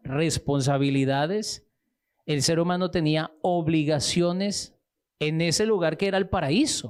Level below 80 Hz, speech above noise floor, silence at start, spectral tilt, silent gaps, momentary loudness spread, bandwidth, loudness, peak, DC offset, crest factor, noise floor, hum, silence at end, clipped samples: -52 dBFS; 54 dB; 0.05 s; -5 dB/octave; none; 7 LU; 14.5 kHz; -25 LUFS; -12 dBFS; under 0.1%; 14 dB; -78 dBFS; none; 0 s; under 0.1%